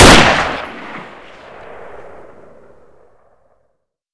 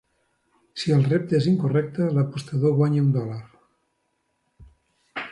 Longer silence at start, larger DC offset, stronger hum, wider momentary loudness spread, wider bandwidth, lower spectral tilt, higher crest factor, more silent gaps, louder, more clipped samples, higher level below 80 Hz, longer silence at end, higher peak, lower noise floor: second, 0 s vs 0.75 s; neither; neither; first, 29 LU vs 14 LU; about the same, 11 kHz vs 11 kHz; second, -3.5 dB/octave vs -8 dB/octave; about the same, 16 dB vs 16 dB; neither; first, -11 LUFS vs -22 LUFS; first, 0.6% vs under 0.1%; first, -26 dBFS vs -62 dBFS; first, 2.2 s vs 0 s; first, 0 dBFS vs -10 dBFS; second, -66 dBFS vs -73 dBFS